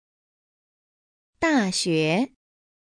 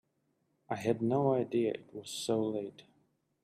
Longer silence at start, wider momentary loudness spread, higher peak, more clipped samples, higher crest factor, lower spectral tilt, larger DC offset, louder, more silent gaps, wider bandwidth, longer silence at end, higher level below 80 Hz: first, 1.4 s vs 0.7 s; second, 5 LU vs 12 LU; first, -10 dBFS vs -16 dBFS; neither; about the same, 18 dB vs 18 dB; second, -4.5 dB/octave vs -6 dB/octave; neither; first, -23 LUFS vs -34 LUFS; neither; second, 10 kHz vs 15 kHz; about the same, 0.55 s vs 0.65 s; first, -60 dBFS vs -76 dBFS